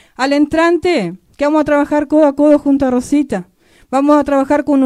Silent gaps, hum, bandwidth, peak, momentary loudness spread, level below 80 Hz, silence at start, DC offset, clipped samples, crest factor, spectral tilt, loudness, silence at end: none; none; 11.5 kHz; 0 dBFS; 8 LU; -44 dBFS; 0.2 s; under 0.1%; under 0.1%; 12 dB; -5.5 dB/octave; -13 LUFS; 0 s